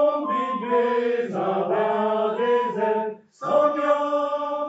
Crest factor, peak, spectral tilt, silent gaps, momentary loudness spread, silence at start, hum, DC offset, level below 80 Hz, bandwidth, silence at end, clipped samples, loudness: 14 dB; -8 dBFS; -6.5 dB/octave; none; 4 LU; 0 s; none; under 0.1%; -80 dBFS; 7.8 kHz; 0 s; under 0.1%; -23 LUFS